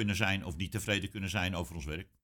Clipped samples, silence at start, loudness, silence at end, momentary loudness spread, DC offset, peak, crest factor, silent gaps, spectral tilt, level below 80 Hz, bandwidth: under 0.1%; 0 s; -34 LUFS; 0.2 s; 9 LU; under 0.1%; -14 dBFS; 20 dB; none; -4.5 dB/octave; -50 dBFS; 19 kHz